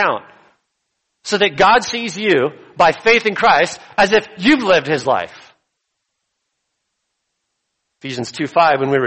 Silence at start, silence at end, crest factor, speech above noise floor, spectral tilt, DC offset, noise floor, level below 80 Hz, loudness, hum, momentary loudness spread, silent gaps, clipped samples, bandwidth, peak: 0 s; 0 s; 16 dB; 59 dB; -4 dB/octave; under 0.1%; -74 dBFS; -54 dBFS; -15 LUFS; none; 13 LU; none; under 0.1%; 8.8 kHz; 0 dBFS